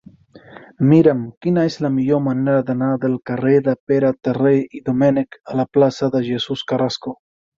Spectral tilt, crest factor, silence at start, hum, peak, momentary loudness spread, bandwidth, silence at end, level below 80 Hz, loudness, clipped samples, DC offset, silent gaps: -7.5 dB/octave; 16 dB; 0.55 s; none; -2 dBFS; 8 LU; 7.4 kHz; 0.45 s; -58 dBFS; -18 LUFS; under 0.1%; under 0.1%; 1.37-1.41 s, 3.80-3.87 s